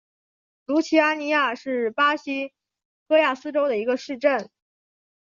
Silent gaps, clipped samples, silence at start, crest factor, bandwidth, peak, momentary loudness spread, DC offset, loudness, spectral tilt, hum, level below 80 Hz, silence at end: 2.85-3.06 s; under 0.1%; 0.7 s; 18 dB; 7.4 kHz; -6 dBFS; 8 LU; under 0.1%; -23 LUFS; -3.5 dB/octave; none; -76 dBFS; 0.8 s